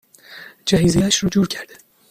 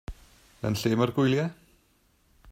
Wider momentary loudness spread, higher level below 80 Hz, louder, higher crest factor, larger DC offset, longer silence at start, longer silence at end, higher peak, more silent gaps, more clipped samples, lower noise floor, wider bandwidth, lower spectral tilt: first, 23 LU vs 11 LU; first, -42 dBFS vs -52 dBFS; first, -18 LUFS vs -27 LUFS; about the same, 18 dB vs 18 dB; neither; first, 0.3 s vs 0.1 s; first, 0.45 s vs 0 s; first, -2 dBFS vs -10 dBFS; neither; neither; second, -41 dBFS vs -66 dBFS; about the same, 15.5 kHz vs 16 kHz; second, -4.5 dB/octave vs -6.5 dB/octave